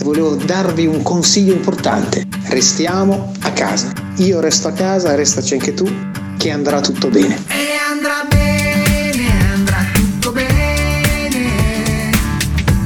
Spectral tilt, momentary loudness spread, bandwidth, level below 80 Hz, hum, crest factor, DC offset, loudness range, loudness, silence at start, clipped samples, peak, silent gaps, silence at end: -4.5 dB/octave; 6 LU; 19 kHz; -26 dBFS; none; 14 dB; 0.1%; 1 LU; -15 LUFS; 0 s; under 0.1%; 0 dBFS; none; 0 s